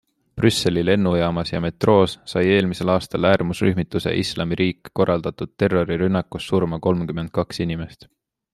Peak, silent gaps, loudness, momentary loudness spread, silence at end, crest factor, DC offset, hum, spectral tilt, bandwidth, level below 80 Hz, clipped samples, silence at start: -2 dBFS; none; -21 LUFS; 7 LU; 0.6 s; 18 dB; under 0.1%; none; -6 dB/octave; 13 kHz; -48 dBFS; under 0.1%; 0.35 s